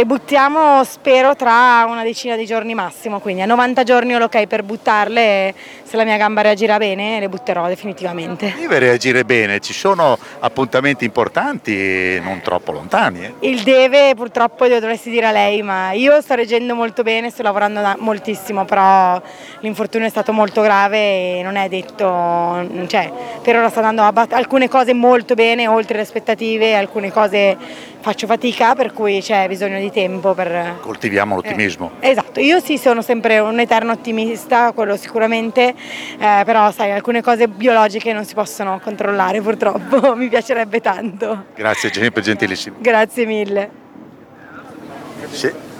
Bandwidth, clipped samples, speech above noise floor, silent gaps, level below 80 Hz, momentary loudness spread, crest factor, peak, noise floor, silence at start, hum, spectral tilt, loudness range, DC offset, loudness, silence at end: 16.5 kHz; under 0.1%; 24 dB; none; -62 dBFS; 10 LU; 14 dB; 0 dBFS; -39 dBFS; 0 s; none; -4.5 dB/octave; 3 LU; under 0.1%; -15 LUFS; 0 s